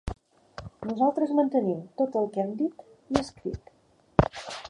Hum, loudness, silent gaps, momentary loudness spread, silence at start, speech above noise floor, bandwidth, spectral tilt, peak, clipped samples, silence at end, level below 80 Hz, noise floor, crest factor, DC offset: none; -28 LUFS; none; 19 LU; 0.05 s; 36 dB; 11 kHz; -7 dB/octave; 0 dBFS; under 0.1%; 0 s; -46 dBFS; -63 dBFS; 28 dB; under 0.1%